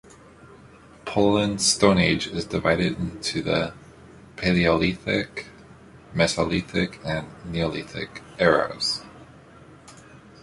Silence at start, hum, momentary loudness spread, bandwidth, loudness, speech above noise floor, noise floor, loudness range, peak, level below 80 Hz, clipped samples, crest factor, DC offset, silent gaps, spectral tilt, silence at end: 0.45 s; none; 14 LU; 11.5 kHz; -23 LUFS; 26 dB; -49 dBFS; 5 LU; -2 dBFS; -46 dBFS; under 0.1%; 22 dB; under 0.1%; none; -4.5 dB/octave; 0.25 s